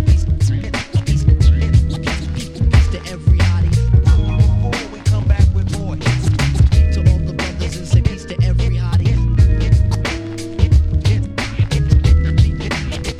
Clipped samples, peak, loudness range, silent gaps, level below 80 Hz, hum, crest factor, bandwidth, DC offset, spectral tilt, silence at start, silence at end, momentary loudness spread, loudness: under 0.1%; 0 dBFS; 1 LU; none; -18 dBFS; none; 14 dB; 11 kHz; under 0.1%; -6.5 dB/octave; 0 s; 0 s; 8 LU; -16 LUFS